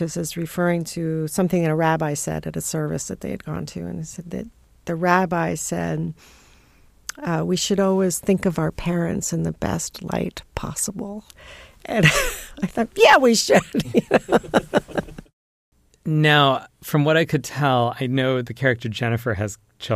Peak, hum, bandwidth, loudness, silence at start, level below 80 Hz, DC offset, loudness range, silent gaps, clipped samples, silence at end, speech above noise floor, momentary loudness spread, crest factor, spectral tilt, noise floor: -2 dBFS; none; 15.5 kHz; -21 LUFS; 0 s; -44 dBFS; under 0.1%; 7 LU; 15.33-15.72 s; under 0.1%; 0 s; 32 dB; 15 LU; 20 dB; -4.5 dB/octave; -53 dBFS